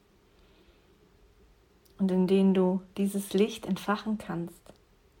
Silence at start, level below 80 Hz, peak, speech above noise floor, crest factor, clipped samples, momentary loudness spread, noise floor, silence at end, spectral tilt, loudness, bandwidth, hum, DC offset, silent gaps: 2 s; -64 dBFS; -12 dBFS; 34 dB; 18 dB; under 0.1%; 11 LU; -62 dBFS; 0.7 s; -7 dB/octave; -28 LUFS; 16.5 kHz; none; under 0.1%; none